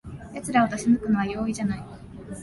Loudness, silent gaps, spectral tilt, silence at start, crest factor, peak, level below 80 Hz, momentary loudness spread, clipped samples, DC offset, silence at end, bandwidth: -25 LUFS; none; -6 dB/octave; 0.05 s; 18 dB; -8 dBFS; -48 dBFS; 18 LU; under 0.1%; under 0.1%; 0 s; 11.5 kHz